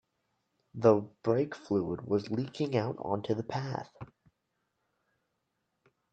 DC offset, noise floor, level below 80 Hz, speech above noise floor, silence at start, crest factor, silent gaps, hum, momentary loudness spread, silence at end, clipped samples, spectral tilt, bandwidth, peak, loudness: under 0.1%; -81 dBFS; -70 dBFS; 51 dB; 0.75 s; 24 dB; none; none; 17 LU; 2.05 s; under 0.1%; -8 dB/octave; 8.2 kHz; -10 dBFS; -32 LUFS